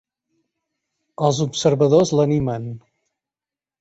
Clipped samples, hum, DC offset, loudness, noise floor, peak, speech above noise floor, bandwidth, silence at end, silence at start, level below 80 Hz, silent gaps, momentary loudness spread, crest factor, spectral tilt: under 0.1%; none; under 0.1%; -18 LUFS; under -90 dBFS; -2 dBFS; over 72 dB; 8.2 kHz; 1 s; 1.2 s; -52 dBFS; none; 15 LU; 18 dB; -6 dB/octave